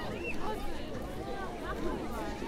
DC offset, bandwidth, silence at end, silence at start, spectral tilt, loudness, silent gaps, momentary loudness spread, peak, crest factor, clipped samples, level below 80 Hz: under 0.1%; 15.5 kHz; 0 s; 0 s; -5.5 dB/octave; -38 LUFS; none; 4 LU; -20 dBFS; 16 dB; under 0.1%; -42 dBFS